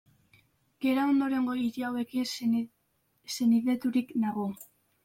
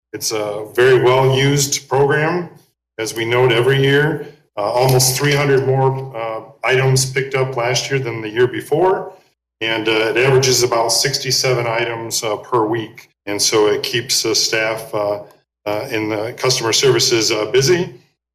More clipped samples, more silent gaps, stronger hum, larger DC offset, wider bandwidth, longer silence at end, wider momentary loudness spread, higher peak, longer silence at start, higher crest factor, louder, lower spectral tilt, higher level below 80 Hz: neither; neither; neither; neither; about the same, 16.5 kHz vs 16 kHz; about the same, 0.4 s vs 0.4 s; about the same, 10 LU vs 11 LU; second, -16 dBFS vs -4 dBFS; first, 0.8 s vs 0.15 s; about the same, 14 dB vs 12 dB; second, -29 LUFS vs -16 LUFS; first, -5 dB/octave vs -3.5 dB/octave; second, -72 dBFS vs -52 dBFS